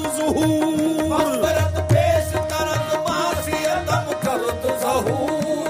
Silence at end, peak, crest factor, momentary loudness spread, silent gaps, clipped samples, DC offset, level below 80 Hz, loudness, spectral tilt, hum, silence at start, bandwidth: 0 s; -6 dBFS; 16 dB; 4 LU; none; under 0.1%; under 0.1%; -40 dBFS; -20 LUFS; -5.5 dB/octave; none; 0 s; 15.5 kHz